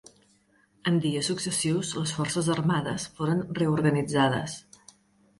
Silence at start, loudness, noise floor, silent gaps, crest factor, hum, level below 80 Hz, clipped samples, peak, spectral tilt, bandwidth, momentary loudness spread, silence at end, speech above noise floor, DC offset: 0.85 s; -27 LUFS; -64 dBFS; none; 18 dB; none; -60 dBFS; under 0.1%; -10 dBFS; -5 dB/octave; 11.5 kHz; 7 LU; 0.8 s; 38 dB; under 0.1%